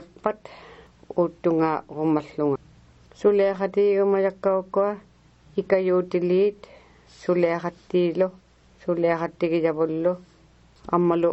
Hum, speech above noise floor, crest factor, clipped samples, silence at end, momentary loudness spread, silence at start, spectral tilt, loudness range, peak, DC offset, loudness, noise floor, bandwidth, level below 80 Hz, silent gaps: none; 32 dB; 18 dB; under 0.1%; 0 s; 11 LU; 0 s; -8.5 dB/octave; 3 LU; -6 dBFS; under 0.1%; -24 LUFS; -55 dBFS; 8 kHz; -60 dBFS; none